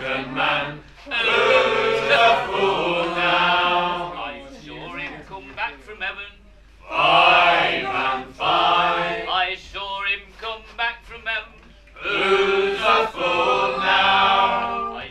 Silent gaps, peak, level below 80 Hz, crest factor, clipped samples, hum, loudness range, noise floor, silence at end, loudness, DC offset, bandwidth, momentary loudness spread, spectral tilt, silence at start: none; -2 dBFS; -48 dBFS; 20 dB; under 0.1%; none; 7 LU; -48 dBFS; 0 s; -19 LUFS; under 0.1%; 12 kHz; 16 LU; -3.5 dB/octave; 0 s